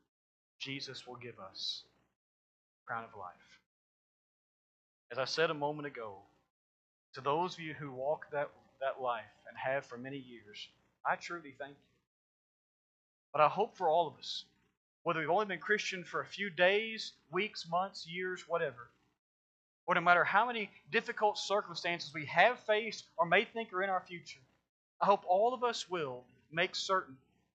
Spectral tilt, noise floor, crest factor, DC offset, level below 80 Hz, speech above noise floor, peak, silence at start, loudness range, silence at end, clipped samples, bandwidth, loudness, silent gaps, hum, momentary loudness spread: -4 dB/octave; under -90 dBFS; 26 dB; under 0.1%; -86 dBFS; over 55 dB; -12 dBFS; 0.6 s; 12 LU; 0.4 s; under 0.1%; 8.8 kHz; -35 LUFS; 2.16-2.86 s, 3.66-5.10 s, 6.50-7.13 s, 12.07-13.33 s, 14.77-15.05 s, 19.19-19.87 s, 24.69-25.00 s; none; 19 LU